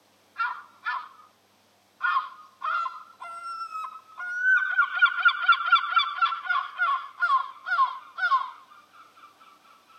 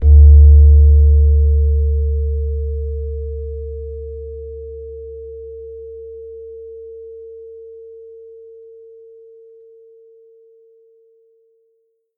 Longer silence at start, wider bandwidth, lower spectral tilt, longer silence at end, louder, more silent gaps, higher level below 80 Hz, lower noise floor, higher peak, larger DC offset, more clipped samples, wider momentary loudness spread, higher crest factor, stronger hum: first, 0.35 s vs 0 s; first, 9.2 kHz vs 0.7 kHz; second, 1.5 dB/octave vs -15 dB/octave; second, 0.75 s vs 4.8 s; second, -25 LUFS vs -13 LUFS; neither; second, under -90 dBFS vs -16 dBFS; about the same, -63 dBFS vs -64 dBFS; second, -8 dBFS vs 0 dBFS; neither; neither; second, 16 LU vs 27 LU; first, 20 dB vs 14 dB; neither